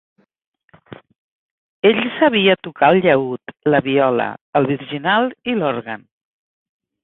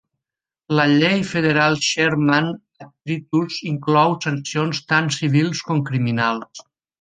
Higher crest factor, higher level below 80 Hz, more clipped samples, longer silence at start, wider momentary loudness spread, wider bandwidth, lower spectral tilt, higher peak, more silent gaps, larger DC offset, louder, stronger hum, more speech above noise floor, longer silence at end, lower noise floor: about the same, 18 dB vs 18 dB; about the same, -60 dBFS vs -60 dBFS; neither; first, 0.9 s vs 0.7 s; about the same, 9 LU vs 10 LU; second, 4.1 kHz vs 9.6 kHz; first, -10 dB/octave vs -5 dB/octave; about the same, 0 dBFS vs -2 dBFS; first, 1.18-1.82 s, 4.41-4.53 s vs none; neither; about the same, -17 LUFS vs -19 LUFS; neither; second, 25 dB vs 68 dB; first, 1.05 s vs 0.4 s; second, -42 dBFS vs -87 dBFS